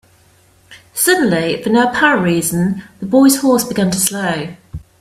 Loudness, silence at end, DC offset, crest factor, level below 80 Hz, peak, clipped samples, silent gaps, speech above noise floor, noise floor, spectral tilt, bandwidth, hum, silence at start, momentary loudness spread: -14 LUFS; 0.25 s; under 0.1%; 16 dB; -48 dBFS; 0 dBFS; under 0.1%; none; 37 dB; -51 dBFS; -4 dB/octave; 16 kHz; none; 0.7 s; 14 LU